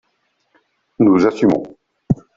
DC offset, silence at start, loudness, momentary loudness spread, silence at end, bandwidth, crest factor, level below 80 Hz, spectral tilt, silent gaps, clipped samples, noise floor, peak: under 0.1%; 1 s; -16 LUFS; 10 LU; 0.25 s; 7.6 kHz; 16 dB; -48 dBFS; -8.5 dB/octave; none; under 0.1%; -67 dBFS; -2 dBFS